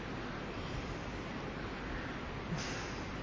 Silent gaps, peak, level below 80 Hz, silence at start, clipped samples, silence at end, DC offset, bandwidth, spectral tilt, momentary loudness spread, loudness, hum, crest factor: none; -28 dBFS; -50 dBFS; 0 s; under 0.1%; 0 s; under 0.1%; 7.6 kHz; -5 dB/octave; 3 LU; -41 LUFS; none; 12 dB